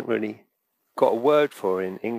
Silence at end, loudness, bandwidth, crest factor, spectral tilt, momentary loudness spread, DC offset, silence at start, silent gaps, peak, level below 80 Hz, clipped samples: 0 s; -23 LUFS; 15.5 kHz; 18 dB; -6 dB/octave; 11 LU; under 0.1%; 0 s; none; -6 dBFS; -80 dBFS; under 0.1%